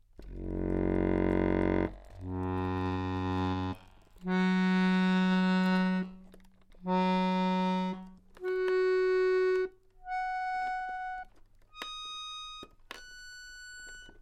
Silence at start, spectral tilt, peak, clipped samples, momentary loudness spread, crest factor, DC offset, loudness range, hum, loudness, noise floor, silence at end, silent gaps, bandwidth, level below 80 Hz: 0.2 s; -7 dB/octave; -16 dBFS; under 0.1%; 19 LU; 16 dB; under 0.1%; 9 LU; none; -31 LUFS; -57 dBFS; 0.1 s; none; 8.8 kHz; -48 dBFS